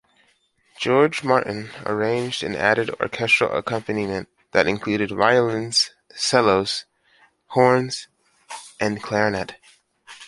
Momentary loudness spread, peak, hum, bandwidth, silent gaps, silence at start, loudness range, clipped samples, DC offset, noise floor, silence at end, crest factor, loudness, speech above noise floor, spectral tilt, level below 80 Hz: 12 LU; -2 dBFS; none; 11.5 kHz; none; 0.8 s; 3 LU; under 0.1%; under 0.1%; -63 dBFS; 0 s; 20 dB; -21 LUFS; 42 dB; -4 dB/octave; -56 dBFS